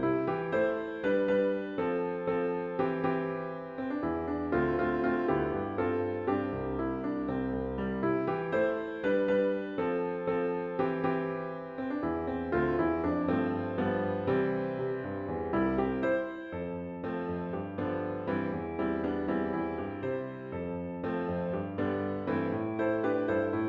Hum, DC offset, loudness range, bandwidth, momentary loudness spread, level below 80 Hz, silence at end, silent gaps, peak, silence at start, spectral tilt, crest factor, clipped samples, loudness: none; under 0.1%; 3 LU; 6.8 kHz; 7 LU; -56 dBFS; 0 s; none; -16 dBFS; 0 s; -9.5 dB/octave; 16 dB; under 0.1%; -32 LUFS